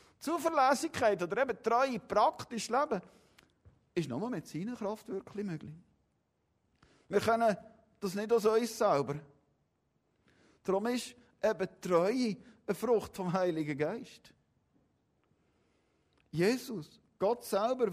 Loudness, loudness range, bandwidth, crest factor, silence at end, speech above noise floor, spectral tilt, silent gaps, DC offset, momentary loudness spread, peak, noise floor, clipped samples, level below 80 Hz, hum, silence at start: -33 LUFS; 7 LU; 15.5 kHz; 20 dB; 0 s; 46 dB; -5 dB/octave; none; under 0.1%; 13 LU; -14 dBFS; -78 dBFS; under 0.1%; -72 dBFS; none; 0.2 s